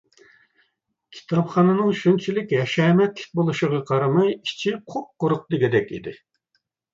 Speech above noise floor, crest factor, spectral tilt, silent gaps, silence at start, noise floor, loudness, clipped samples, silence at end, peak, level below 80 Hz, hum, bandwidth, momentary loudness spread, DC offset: 52 dB; 16 dB; -7 dB/octave; none; 1.1 s; -73 dBFS; -21 LUFS; under 0.1%; 0.8 s; -6 dBFS; -64 dBFS; none; 7.6 kHz; 8 LU; under 0.1%